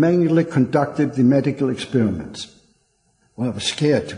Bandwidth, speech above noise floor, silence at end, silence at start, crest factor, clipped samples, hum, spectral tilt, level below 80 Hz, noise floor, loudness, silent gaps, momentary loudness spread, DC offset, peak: 10.5 kHz; 45 dB; 0 s; 0 s; 16 dB; under 0.1%; none; -6.5 dB/octave; -50 dBFS; -64 dBFS; -19 LUFS; none; 12 LU; under 0.1%; -4 dBFS